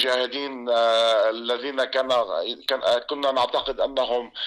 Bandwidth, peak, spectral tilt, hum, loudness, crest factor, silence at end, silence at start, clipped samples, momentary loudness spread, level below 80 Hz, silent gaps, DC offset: 13 kHz; -12 dBFS; -2 dB/octave; none; -23 LUFS; 12 dB; 0 s; 0 s; under 0.1%; 8 LU; -58 dBFS; none; under 0.1%